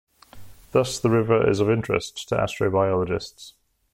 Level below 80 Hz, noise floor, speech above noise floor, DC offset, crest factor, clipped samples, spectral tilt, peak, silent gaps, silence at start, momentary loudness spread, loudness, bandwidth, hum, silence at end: -50 dBFS; -44 dBFS; 21 dB; under 0.1%; 18 dB; under 0.1%; -6 dB/octave; -6 dBFS; none; 0.35 s; 8 LU; -23 LUFS; 16 kHz; none; 0.45 s